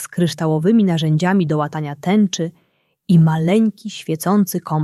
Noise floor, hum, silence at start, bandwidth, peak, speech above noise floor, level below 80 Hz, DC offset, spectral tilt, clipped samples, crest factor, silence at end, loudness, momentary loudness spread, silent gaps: -40 dBFS; none; 0 s; 13.5 kHz; -4 dBFS; 23 dB; -60 dBFS; under 0.1%; -6.5 dB/octave; under 0.1%; 14 dB; 0 s; -17 LUFS; 9 LU; none